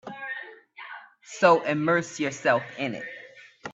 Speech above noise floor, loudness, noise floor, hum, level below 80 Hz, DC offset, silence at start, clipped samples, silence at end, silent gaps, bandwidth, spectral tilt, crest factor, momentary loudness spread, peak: 24 dB; -25 LUFS; -48 dBFS; none; -74 dBFS; under 0.1%; 0.05 s; under 0.1%; 0 s; none; 8.2 kHz; -5 dB/octave; 22 dB; 23 LU; -4 dBFS